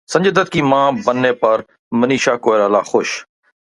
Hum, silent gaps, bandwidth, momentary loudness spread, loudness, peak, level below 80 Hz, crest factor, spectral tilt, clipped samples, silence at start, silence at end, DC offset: none; 1.79-1.91 s; 11.5 kHz; 6 LU; -15 LUFS; 0 dBFS; -56 dBFS; 16 dB; -5 dB/octave; under 0.1%; 0.1 s; 0.45 s; under 0.1%